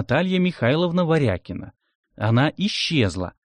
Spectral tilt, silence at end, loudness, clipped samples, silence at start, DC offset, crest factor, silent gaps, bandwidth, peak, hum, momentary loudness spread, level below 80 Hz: -6.5 dB/octave; 0.15 s; -21 LUFS; under 0.1%; 0 s; under 0.1%; 14 dB; 1.95-2.03 s; 10.5 kHz; -8 dBFS; none; 8 LU; -50 dBFS